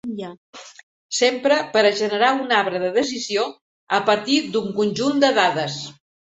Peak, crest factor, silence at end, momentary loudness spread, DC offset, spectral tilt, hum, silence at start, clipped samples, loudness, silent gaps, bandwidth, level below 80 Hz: -2 dBFS; 18 dB; 0.3 s; 15 LU; under 0.1%; -3.5 dB/octave; none; 0.05 s; under 0.1%; -20 LUFS; 0.37-0.53 s, 0.83-1.09 s, 3.61-3.87 s; 8.4 kHz; -66 dBFS